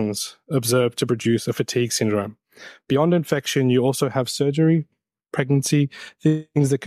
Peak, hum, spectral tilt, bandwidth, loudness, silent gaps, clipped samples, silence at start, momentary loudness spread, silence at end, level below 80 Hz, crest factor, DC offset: -6 dBFS; none; -5.5 dB/octave; 15.5 kHz; -21 LUFS; none; under 0.1%; 0 s; 7 LU; 0 s; -64 dBFS; 16 dB; under 0.1%